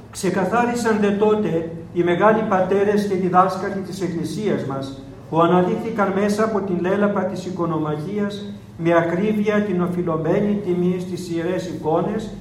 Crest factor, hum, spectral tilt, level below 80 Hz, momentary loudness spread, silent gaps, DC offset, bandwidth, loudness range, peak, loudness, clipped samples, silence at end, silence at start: 18 dB; none; -7 dB/octave; -52 dBFS; 9 LU; none; under 0.1%; 14 kHz; 3 LU; -2 dBFS; -20 LUFS; under 0.1%; 0 s; 0 s